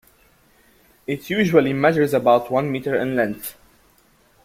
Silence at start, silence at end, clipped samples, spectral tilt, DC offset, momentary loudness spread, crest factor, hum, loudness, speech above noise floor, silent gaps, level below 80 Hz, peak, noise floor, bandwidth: 1.1 s; 0.95 s; under 0.1%; -6.5 dB/octave; under 0.1%; 14 LU; 20 dB; none; -19 LUFS; 38 dB; none; -58 dBFS; -2 dBFS; -57 dBFS; 16.5 kHz